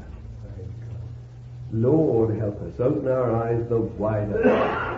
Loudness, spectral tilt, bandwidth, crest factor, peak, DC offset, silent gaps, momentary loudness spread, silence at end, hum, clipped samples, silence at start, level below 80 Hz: -23 LUFS; -9.5 dB/octave; 7 kHz; 18 dB; -6 dBFS; under 0.1%; none; 19 LU; 0 s; none; under 0.1%; 0 s; -44 dBFS